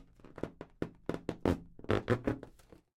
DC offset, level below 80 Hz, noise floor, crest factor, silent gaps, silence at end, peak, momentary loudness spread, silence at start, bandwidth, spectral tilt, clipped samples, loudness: under 0.1%; -54 dBFS; -59 dBFS; 24 dB; none; 0.5 s; -14 dBFS; 12 LU; 0 s; 15.5 kHz; -7.5 dB/octave; under 0.1%; -37 LUFS